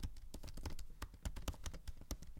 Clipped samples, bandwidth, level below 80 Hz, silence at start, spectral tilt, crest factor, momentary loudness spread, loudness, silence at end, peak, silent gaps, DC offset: under 0.1%; 17 kHz; -48 dBFS; 0 s; -4.5 dB/octave; 24 dB; 6 LU; -51 LUFS; 0 s; -24 dBFS; none; under 0.1%